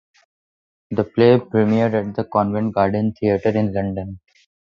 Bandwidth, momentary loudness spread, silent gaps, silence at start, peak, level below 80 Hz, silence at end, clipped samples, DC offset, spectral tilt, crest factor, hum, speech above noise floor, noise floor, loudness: 6.6 kHz; 11 LU; none; 0.9 s; 0 dBFS; -48 dBFS; 0.55 s; under 0.1%; under 0.1%; -9.5 dB/octave; 18 dB; none; over 72 dB; under -90 dBFS; -19 LUFS